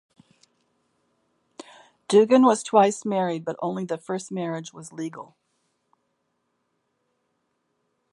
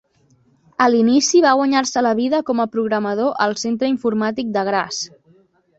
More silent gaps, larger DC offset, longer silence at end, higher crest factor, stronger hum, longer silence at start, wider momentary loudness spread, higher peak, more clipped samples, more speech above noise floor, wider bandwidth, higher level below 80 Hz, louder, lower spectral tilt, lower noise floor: neither; neither; first, 2.9 s vs 0.7 s; first, 22 dB vs 16 dB; neither; first, 2.1 s vs 0.8 s; first, 17 LU vs 8 LU; second, -6 dBFS vs -2 dBFS; neither; first, 52 dB vs 40 dB; first, 11.5 kHz vs 8 kHz; second, -78 dBFS vs -64 dBFS; second, -23 LUFS vs -18 LUFS; first, -5.5 dB/octave vs -3.5 dB/octave; first, -75 dBFS vs -57 dBFS